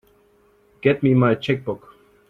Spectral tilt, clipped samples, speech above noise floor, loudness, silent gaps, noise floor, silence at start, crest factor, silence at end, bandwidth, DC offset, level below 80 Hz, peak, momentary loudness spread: -9 dB/octave; under 0.1%; 39 dB; -20 LUFS; none; -58 dBFS; 0.85 s; 20 dB; 0.5 s; 6.4 kHz; under 0.1%; -56 dBFS; -2 dBFS; 13 LU